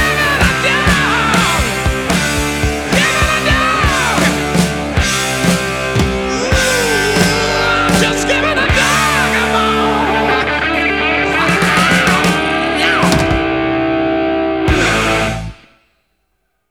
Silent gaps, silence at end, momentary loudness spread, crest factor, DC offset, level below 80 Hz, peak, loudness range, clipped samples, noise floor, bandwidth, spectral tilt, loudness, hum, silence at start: none; 1.15 s; 4 LU; 14 dB; under 0.1%; -26 dBFS; 0 dBFS; 2 LU; under 0.1%; -66 dBFS; 19.5 kHz; -4 dB/octave; -13 LUFS; none; 0 s